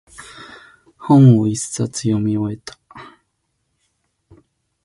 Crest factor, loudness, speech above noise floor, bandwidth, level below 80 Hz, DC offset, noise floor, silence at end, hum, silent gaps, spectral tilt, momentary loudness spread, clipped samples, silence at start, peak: 18 dB; -16 LUFS; 56 dB; 11.5 kHz; -54 dBFS; under 0.1%; -70 dBFS; 1.8 s; none; none; -7 dB/octave; 27 LU; under 0.1%; 0.2 s; -2 dBFS